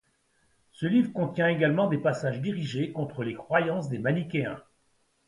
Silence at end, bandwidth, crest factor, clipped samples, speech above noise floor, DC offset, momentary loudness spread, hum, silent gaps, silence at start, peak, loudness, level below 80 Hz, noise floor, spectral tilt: 0.65 s; 11.5 kHz; 20 dB; under 0.1%; 42 dB; under 0.1%; 9 LU; none; none; 0.8 s; -8 dBFS; -28 LUFS; -66 dBFS; -70 dBFS; -7.5 dB/octave